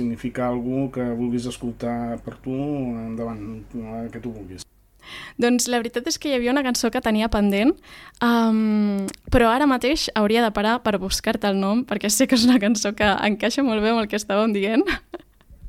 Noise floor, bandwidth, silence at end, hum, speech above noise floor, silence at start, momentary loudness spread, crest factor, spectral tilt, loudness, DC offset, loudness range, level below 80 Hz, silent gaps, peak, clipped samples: -46 dBFS; 16.5 kHz; 0 s; none; 24 dB; 0 s; 14 LU; 18 dB; -4 dB/octave; -21 LUFS; under 0.1%; 9 LU; -42 dBFS; none; -4 dBFS; under 0.1%